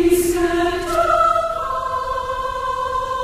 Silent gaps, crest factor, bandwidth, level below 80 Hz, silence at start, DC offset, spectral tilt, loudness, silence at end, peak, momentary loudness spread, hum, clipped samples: none; 14 dB; 15.5 kHz; -36 dBFS; 0 s; under 0.1%; -4.5 dB/octave; -19 LUFS; 0 s; -4 dBFS; 8 LU; none; under 0.1%